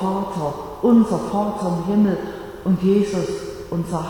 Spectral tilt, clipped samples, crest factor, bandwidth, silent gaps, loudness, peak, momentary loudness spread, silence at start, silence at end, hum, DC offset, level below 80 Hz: -7.5 dB/octave; under 0.1%; 16 dB; 18 kHz; none; -20 LUFS; -4 dBFS; 11 LU; 0 s; 0 s; none; under 0.1%; -46 dBFS